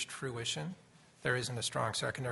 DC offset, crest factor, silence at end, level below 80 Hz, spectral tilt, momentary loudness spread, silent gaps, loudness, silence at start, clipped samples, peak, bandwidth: under 0.1%; 22 dB; 0 s; -68 dBFS; -3.5 dB/octave; 7 LU; none; -36 LUFS; 0 s; under 0.1%; -16 dBFS; 11.5 kHz